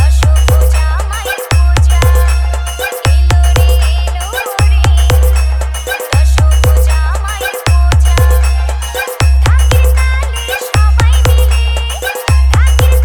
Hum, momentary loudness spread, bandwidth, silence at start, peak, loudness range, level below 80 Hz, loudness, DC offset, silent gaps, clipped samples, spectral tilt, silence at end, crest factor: none; 7 LU; over 20 kHz; 0 s; 0 dBFS; 0 LU; -10 dBFS; -11 LUFS; under 0.1%; none; under 0.1%; -4.5 dB/octave; 0 s; 8 dB